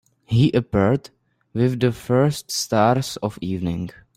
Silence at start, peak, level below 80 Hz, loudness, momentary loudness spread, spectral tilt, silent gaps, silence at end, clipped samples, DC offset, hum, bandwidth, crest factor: 0.3 s; -4 dBFS; -50 dBFS; -21 LUFS; 9 LU; -6 dB/octave; none; 0.25 s; under 0.1%; under 0.1%; none; 16 kHz; 16 dB